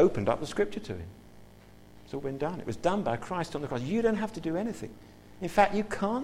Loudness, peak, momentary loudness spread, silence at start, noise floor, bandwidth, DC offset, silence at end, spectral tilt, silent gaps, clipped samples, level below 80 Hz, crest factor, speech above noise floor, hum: -31 LUFS; -10 dBFS; 15 LU; 0 s; -53 dBFS; 15.5 kHz; under 0.1%; 0 s; -6.5 dB/octave; none; under 0.1%; -52 dBFS; 20 dB; 23 dB; 50 Hz at -55 dBFS